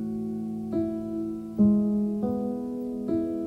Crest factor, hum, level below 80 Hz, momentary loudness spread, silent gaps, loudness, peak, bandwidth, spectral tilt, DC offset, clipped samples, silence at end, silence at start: 16 dB; none; -56 dBFS; 10 LU; none; -28 LUFS; -12 dBFS; 3.9 kHz; -10.5 dB/octave; under 0.1%; under 0.1%; 0 s; 0 s